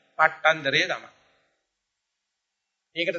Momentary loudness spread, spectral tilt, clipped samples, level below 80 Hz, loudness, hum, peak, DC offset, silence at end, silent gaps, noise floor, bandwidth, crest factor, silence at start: 13 LU; -3 dB/octave; under 0.1%; -76 dBFS; -23 LUFS; none; -4 dBFS; under 0.1%; 0 s; none; -82 dBFS; 7.8 kHz; 24 dB; 0.2 s